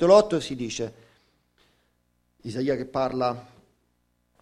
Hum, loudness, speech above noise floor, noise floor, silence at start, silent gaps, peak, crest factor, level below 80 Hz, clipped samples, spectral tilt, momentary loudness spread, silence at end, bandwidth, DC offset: 60 Hz at -60 dBFS; -26 LUFS; 47 dB; -71 dBFS; 0 s; none; -4 dBFS; 22 dB; -58 dBFS; under 0.1%; -5.5 dB/octave; 17 LU; 1 s; 11 kHz; under 0.1%